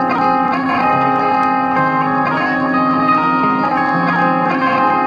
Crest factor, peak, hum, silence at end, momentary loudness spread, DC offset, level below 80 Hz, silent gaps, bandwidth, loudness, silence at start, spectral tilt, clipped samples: 12 dB; -2 dBFS; none; 0 s; 2 LU; under 0.1%; -52 dBFS; none; 7 kHz; -14 LUFS; 0 s; -7.5 dB/octave; under 0.1%